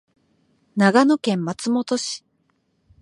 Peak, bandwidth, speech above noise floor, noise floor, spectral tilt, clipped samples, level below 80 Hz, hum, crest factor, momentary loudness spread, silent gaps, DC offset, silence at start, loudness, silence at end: -2 dBFS; 11.5 kHz; 48 dB; -67 dBFS; -5 dB/octave; under 0.1%; -68 dBFS; none; 20 dB; 14 LU; none; under 0.1%; 0.75 s; -20 LUFS; 0.85 s